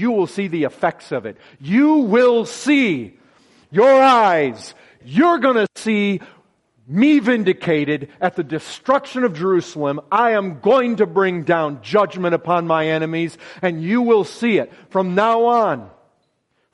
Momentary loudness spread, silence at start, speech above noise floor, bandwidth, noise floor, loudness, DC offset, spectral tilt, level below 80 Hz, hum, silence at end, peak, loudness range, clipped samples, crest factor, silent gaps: 11 LU; 0 s; 50 dB; 11.5 kHz; -67 dBFS; -17 LUFS; under 0.1%; -6 dB/octave; -66 dBFS; none; 0.85 s; -2 dBFS; 3 LU; under 0.1%; 16 dB; none